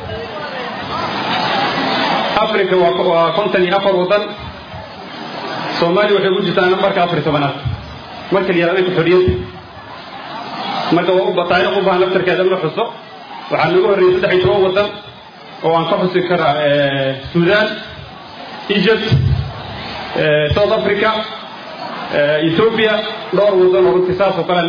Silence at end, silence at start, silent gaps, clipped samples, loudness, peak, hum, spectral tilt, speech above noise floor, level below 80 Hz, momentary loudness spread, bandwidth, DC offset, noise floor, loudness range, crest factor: 0 s; 0 s; none; under 0.1%; -15 LUFS; 0 dBFS; none; -7 dB/octave; 22 dB; -40 dBFS; 17 LU; 5.4 kHz; under 0.1%; -35 dBFS; 2 LU; 14 dB